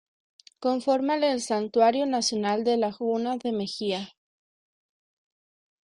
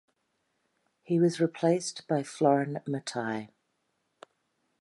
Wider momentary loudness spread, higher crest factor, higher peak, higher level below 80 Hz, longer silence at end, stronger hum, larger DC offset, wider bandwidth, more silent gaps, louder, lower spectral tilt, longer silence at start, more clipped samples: about the same, 8 LU vs 9 LU; about the same, 18 dB vs 20 dB; about the same, -10 dBFS vs -12 dBFS; first, -72 dBFS vs -82 dBFS; first, 1.8 s vs 1.35 s; neither; neither; about the same, 11 kHz vs 11.5 kHz; neither; first, -26 LUFS vs -29 LUFS; second, -4 dB/octave vs -6 dB/octave; second, 0.6 s vs 1.1 s; neither